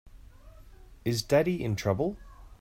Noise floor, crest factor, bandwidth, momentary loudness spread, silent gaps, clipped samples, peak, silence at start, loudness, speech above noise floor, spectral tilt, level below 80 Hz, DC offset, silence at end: -51 dBFS; 20 dB; 16 kHz; 10 LU; none; under 0.1%; -12 dBFS; 0.05 s; -29 LUFS; 23 dB; -6 dB/octave; -50 dBFS; under 0.1%; 0.05 s